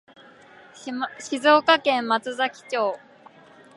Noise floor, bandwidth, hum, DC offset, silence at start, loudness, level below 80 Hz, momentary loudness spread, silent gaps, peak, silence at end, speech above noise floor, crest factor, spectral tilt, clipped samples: -50 dBFS; 11.5 kHz; none; under 0.1%; 0.8 s; -22 LUFS; -76 dBFS; 16 LU; none; -4 dBFS; 0.8 s; 28 dB; 20 dB; -2.5 dB/octave; under 0.1%